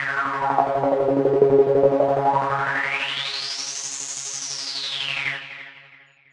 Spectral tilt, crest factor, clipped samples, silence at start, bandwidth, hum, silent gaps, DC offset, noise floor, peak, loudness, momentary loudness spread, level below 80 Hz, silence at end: -3 dB/octave; 18 dB; under 0.1%; 0 s; 11 kHz; none; none; under 0.1%; -51 dBFS; -4 dBFS; -21 LUFS; 11 LU; -58 dBFS; 0.5 s